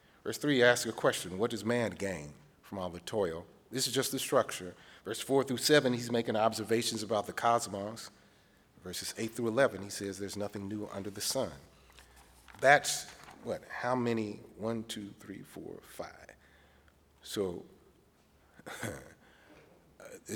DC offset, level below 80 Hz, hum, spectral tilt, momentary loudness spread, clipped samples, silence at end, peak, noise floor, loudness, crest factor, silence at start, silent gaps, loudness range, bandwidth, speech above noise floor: under 0.1%; -68 dBFS; none; -3.5 dB/octave; 20 LU; under 0.1%; 0 s; -8 dBFS; -66 dBFS; -33 LUFS; 26 dB; 0.25 s; none; 13 LU; over 20 kHz; 33 dB